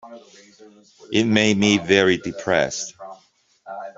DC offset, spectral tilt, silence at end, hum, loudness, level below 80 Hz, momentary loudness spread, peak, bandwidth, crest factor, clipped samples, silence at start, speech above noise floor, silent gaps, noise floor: under 0.1%; -4 dB/octave; 0.05 s; none; -19 LUFS; -58 dBFS; 20 LU; -2 dBFS; 7.8 kHz; 20 dB; under 0.1%; 0.05 s; 38 dB; none; -59 dBFS